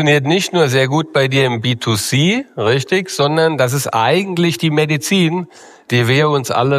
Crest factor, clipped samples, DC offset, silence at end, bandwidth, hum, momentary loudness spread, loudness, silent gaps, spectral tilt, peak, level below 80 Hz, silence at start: 14 dB; under 0.1%; under 0.1%; 0 s; 15.5 kHz; none; 4 LU; -15 LUFS; none; -5 dB/octave; 0 dBFS; -58 dBFS; 0 s